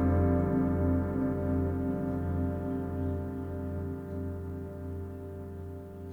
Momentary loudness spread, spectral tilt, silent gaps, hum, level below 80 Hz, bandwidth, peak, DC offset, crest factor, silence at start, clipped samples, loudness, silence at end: 14 LU; -11 dB/octave; none; none; -44 dBFS; 3.1 kHz; -16 dBFS; under 0.1%; 16 dB; 0 s; under 0.1%; -33 LUFS; 0 s